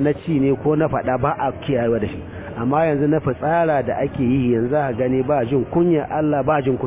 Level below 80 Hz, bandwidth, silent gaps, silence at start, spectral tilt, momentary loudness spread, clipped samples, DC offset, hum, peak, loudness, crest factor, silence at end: -42 dBFS; 4 kHz; none; 0 s; -12 dB/octave; 4 LU; under 0.1%; under 0.1%; none; -6 dBFS; -19 LUFS; 14 dB; 0 s